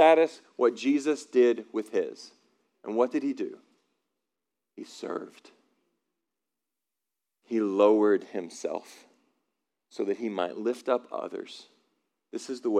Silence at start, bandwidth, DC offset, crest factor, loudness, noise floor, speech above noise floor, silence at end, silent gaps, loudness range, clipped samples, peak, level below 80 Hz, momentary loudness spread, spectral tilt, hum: 0 s; 11.5 kHz; under 0.1%; 22 dB; -28 LUFS; -88 dBFS; 61 dB; 0 s; none; 17 LU; under 0.1%; -8 dBFS; under -90 dBFS; 19 LU; -5 dB/octave; none